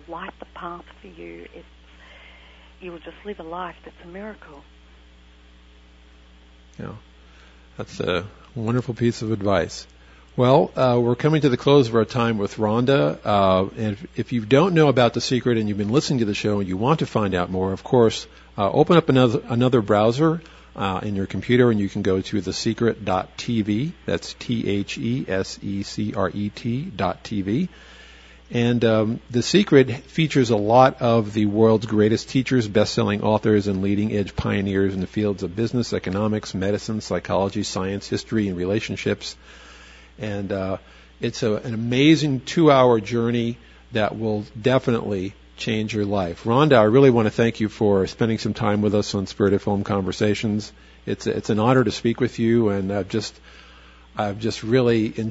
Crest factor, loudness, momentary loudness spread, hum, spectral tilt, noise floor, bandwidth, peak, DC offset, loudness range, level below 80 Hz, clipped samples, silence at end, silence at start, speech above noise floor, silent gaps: 22 dB; -21 LUFS; 16 LU; none; -6.5 dB/octave; -49 dBFS; 8 kHz; 0 dBFS; under 0.1%; 9 LU; -50 dBFS; under 0.1%; 0 s; 0.1 s; 29 dB; none